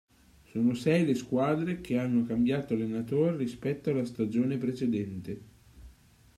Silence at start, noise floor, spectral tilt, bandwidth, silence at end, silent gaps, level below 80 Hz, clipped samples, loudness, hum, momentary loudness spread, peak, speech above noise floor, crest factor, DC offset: 0.55 s; -58 dBFS; -7.5 dB/octave; 13 kHz; 0.45 s; none; -60 dBFS; under 0.1%; -30 LUFS; none; 7 LU; -14 dBFS; 29 dB; 16 dB; under 0.1%